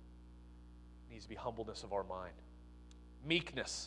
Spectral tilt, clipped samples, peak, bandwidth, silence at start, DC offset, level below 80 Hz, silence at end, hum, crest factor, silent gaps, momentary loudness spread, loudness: -3.5 dB/octave; under 0.1%; -20 dBFS; 11.5 kHz; 0 s; under 0.1%; -58 dBFS; 0 s; 60 Hz at -55 dBFS; 26 dB; none; 23 LU; -42 LUFS